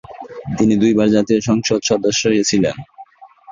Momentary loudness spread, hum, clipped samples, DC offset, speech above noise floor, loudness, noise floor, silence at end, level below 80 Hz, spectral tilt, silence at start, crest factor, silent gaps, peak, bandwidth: 15 LU; none; under 0.1%; under 0.1%; 26 dB; -15 LUFS; -41 dBFS; 0 s; -48 dBFS; -4.5 dB/octave; 0.1 s; 14 dB; none; -2 dBFS; 7.6 kHz